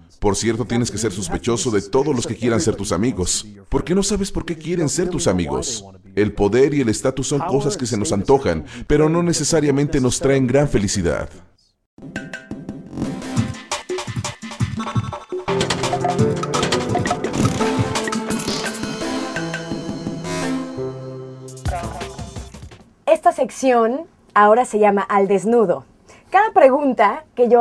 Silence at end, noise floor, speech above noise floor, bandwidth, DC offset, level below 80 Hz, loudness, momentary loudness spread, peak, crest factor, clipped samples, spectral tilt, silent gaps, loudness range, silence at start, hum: 0 s; -41 dBFS; 23 dB; 13.5 kHz; under 0.1%; -38 dBFS; -19 LUFS; 13 LU; 0 dBFS; 20 dB; under 0.1%; -5 dB/octave; 11.86-11.97 s; 9 LU; 0.2 s; none